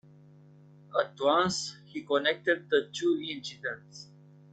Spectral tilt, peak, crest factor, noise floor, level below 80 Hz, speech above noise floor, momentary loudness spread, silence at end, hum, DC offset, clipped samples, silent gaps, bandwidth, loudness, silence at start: -3.5 dB/octave; -12 dBFS; 20 dB; -55 dBFS; -72 dBFS; 26 dB; 15 LU; 0.5 s; none; under 0.1%; under 0.1%; none; 9.2 kHz; -30 LUFS; 0.9 s